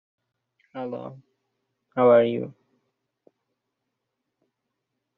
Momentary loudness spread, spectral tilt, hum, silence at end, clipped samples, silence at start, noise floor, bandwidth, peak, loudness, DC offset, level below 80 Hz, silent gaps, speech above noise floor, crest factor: 22 LU; -5.5 dB/octave; none; 2.65 s; under 0.1%; 0.75 s; -81 dBFS; 4.1 kHz; -6 dBFS; -22 LUFS; under 0.1%; -78 dBFS; none; 59 dB; 22 dB